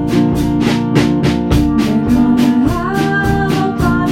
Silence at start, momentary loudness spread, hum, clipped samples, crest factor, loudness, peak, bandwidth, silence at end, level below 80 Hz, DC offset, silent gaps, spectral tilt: 0 s; 3 LU; none; under 0.1%; 12 dB; -13 LUFS; 0 dBFS; 16 kHz; 0 s; -26 dBFS; under 0.1%; none; -7 dB/octave